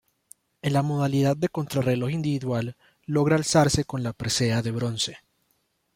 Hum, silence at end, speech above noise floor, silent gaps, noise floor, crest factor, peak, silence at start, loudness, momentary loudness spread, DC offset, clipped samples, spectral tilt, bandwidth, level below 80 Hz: none; 0.8 s; 47 dB; none; -71 dBFS; 20 dB; -6 dBFS; 0.65 s; -25 LUFS; 9 LU; under 0.1%; under 0.1%; -5.5 dB/octave; 16.5 kHz; -52 dBFS